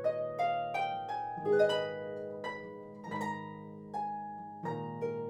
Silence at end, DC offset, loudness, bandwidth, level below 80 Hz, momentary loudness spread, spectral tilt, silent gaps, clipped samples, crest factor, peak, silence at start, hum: 0 s; under 0.1%; -36 LUFS; 13 kHz; -74 dBFS; 15 LU; -6 dB/octave; none; under 0.1%; 20 dB; -16 dBFS; 0 s; none